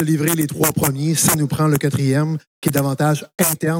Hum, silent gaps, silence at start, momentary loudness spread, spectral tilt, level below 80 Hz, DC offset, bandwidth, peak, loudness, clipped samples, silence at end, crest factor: none; 2.47-2.62 s; 0 s; 4 LU; -5 dB/octave; -50 dBFS; under 0.1%; 17.5 kHz; -4 dBFS; -18 LUFS; under 0.1%; 0 s; 14 dB